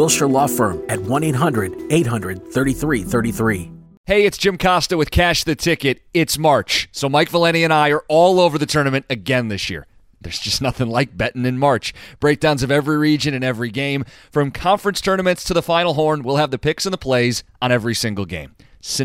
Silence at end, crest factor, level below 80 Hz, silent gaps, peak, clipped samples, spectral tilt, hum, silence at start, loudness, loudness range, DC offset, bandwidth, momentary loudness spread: 0 s; 16 dB; -40 dBFS; 3.97-4.04 s; -2 dBFS; under 0.1%; -4.5 dB/octave; none; 0 s; -18 LUFS; 4 LU; under 0.1%; 16.5 kHz; 9 LU